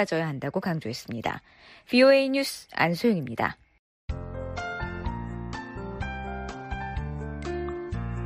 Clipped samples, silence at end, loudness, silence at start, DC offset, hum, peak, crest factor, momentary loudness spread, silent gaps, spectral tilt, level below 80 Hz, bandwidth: under 0.1%; 0 s; -28 LUFS; 0 s; under 0.1%; none; -8 dBFS; 20 dB; 15 LU; 3.79-4.08 s; -6 dB/octave; -42 dBFS; 15 kHz